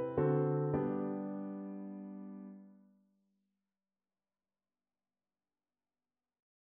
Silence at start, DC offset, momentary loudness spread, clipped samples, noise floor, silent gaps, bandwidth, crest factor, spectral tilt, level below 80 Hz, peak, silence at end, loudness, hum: 0 s; under 0.1%; 18 LU; under 0.1%; under -90 dBFS; none; 3.4 kHz; 20 dB; -10.5 dB/octave; -72 dBFS; -20 dBFS; 4 s; -37 LUFS; none